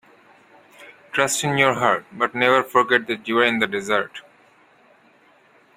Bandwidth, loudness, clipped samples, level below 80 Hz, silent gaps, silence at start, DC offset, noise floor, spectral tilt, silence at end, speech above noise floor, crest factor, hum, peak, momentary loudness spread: 16 kHz; -20 LUFS; under 0.1%; -64 dBFS; none; 0.8 s; under 0.1%; -55 dBFS; -3.5 dB/octave; 1.55 s; 35 dB; 22 dB; none; -2 dBFS; 7 LU